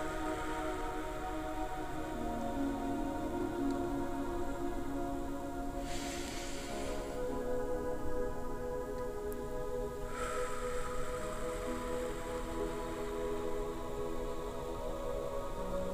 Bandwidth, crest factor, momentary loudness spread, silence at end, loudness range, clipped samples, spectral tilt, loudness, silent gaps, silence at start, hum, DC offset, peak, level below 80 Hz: 16 kHz; 14 dB; 4 LU; 0 s; 2 LU; under 0.1%; -5 dB/octave; -39 LUFS; none; 0 s; none; under 0.1%; -22 dBFS; -44 dBFS